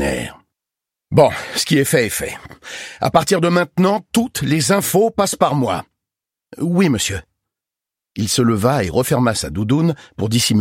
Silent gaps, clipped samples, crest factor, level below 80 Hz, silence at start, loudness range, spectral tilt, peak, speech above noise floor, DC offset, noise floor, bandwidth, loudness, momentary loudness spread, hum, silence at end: none; under 0.1%; 18 dB; -44 dBFS; 0 s; 3 LU; -5 dB/octave; 0 dBFS; 70 dB; under 0.1%; -86 dBFS; 16.5 kHz; -17 LUFS; 11 LU; none; 0 s